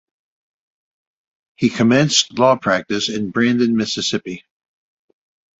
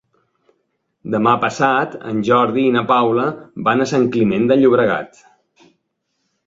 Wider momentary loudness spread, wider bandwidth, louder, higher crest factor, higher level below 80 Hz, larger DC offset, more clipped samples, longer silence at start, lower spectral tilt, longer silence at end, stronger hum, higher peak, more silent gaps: about the same, 8 LU vs 9 LU; about the same, 8 kHz vs 7.8 kHz; about the same, -17 LUFS vs -16 LUFS; about the same, 20 dB vs 16 dB; about the same, -58 dBFS vs -58 dBFS; neither; neither; first, 1.6 s vs 1.05 s; second, -4 dB/octave vs -6.5 dB/octave; second, 1.2 s vs 1.4 s; neither; about the same, 0 dBFS vs -2 dBFS; neither